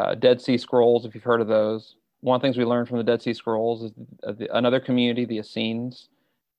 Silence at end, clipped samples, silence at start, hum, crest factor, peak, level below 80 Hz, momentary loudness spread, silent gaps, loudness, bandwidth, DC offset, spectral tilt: 0.6 s; under 0.1%; 0 s; none; 18 dB; -6 dBFS; -68 dBFS; 13 LU; none; -23 LUFS; 8.6 kHz; under 0.1%; -7 dB/octave